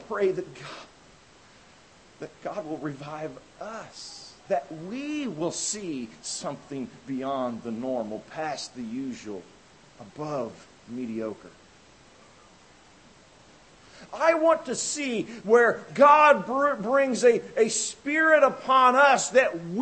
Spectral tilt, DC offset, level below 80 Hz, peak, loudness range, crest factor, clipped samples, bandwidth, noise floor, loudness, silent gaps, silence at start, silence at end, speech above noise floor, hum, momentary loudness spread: -3.5 dB/octave; under 0.1%; -68 dBFS; -6 dBFS; 17 LU; 22 dB; under 0.1%; 8.8 kHz; -55 dBFS; -24 LUFS; none; 0 s; 0 s; 29 dB; none; 21 LU